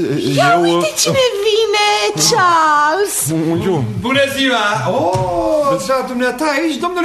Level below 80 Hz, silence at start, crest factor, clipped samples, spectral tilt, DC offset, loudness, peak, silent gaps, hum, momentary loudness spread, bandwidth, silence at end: -46 dBFS; 0 s; 14 dB; under 0.1%; -3.5 dB/octave; under 0.1%; -14 LUFS; -2 dBFS; none; none; 5 LU; 13.5 kHz; 0 s